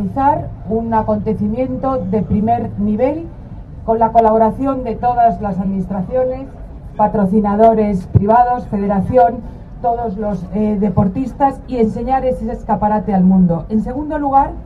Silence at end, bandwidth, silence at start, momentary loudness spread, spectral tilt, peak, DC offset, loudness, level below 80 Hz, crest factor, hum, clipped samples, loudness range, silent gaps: 0 s; 4.8 kHz; 0 s; 10 LU; -10.5 dB/octave; 0 dBFS; under 0.1%; -16 LUFS; -32 dBFS; 16 dB; none; under 0.1%; 3 LU; none